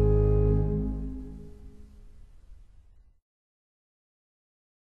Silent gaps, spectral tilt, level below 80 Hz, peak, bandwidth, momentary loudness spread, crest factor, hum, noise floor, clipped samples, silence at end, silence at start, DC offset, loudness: none; -12 dB/octave; -34 dBFS; -12 dBFS; 2.6 kHz; 22 LU; 18 dB; none; -55 dBFS; under 0.1%; 2.45 s; 0 s; under 0.1%; -27 LUFS